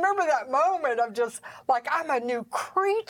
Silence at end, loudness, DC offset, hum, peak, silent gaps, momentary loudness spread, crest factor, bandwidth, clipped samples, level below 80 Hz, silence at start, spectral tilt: 0.05 s; -26 LUFS; under 0.1%; none; -12 dBFS; none; 7 LU; 14 dB; 17.5 kHz; under 0.1%; -78 dBFS; 0 s; -3 dB/octave